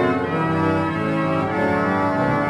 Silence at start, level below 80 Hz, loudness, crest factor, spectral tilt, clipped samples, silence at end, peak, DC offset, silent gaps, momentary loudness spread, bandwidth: 0 s; -50 dBFS; -20 LUFS; 12 dB; -8 dB/octave; under 0.1%; 0 s; -8 dBFS; under 0.1%; none; 2 LU; 12 kHz